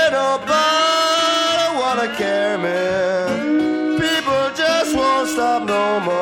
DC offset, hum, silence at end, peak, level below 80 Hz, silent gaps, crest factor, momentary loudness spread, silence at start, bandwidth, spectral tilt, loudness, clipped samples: under 0.1%; none; 0 s; -6 dBFS; -52 dBFS; none; 12 dB; 4 LU; 0 s; 17 kHz; -3 dB/octave; -17 LUFS; under 0.1%